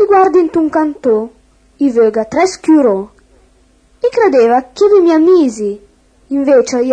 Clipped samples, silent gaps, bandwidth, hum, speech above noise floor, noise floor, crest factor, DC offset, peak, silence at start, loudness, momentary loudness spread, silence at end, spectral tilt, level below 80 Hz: under 0.1%; none; 9.8 kHz; none; 39 dB; -50 dBFS; 12 dB; under 0.1%; 0 dBFS; 0 s; -11 LUFS; 12 LU; 0 s; -5 dB/octave; -50 dBFS